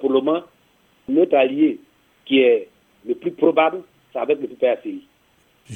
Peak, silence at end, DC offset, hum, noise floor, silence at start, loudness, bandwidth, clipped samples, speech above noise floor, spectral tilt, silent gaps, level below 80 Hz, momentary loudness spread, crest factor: -2 dBFS; 0 s; under 0.1%; none; -59 dBFS; 0 s; -19 LUFS; 3.9 kHz; under 0.1%; 41 dB; -6.5 dB/octave; none; -70 dBFS; 18 LU; 18 dB